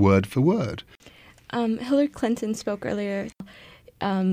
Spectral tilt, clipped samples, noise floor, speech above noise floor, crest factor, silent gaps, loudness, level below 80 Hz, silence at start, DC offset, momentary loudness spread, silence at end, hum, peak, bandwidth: -7 dB/octave; under 0.1%; -51 dBFS; 27 dB; 18 dB; none; -25 LUFS; -56 dBFS; 0 s; under 0.1%; 14 LU; 0 s; none; -6 dBFS; 16 kHz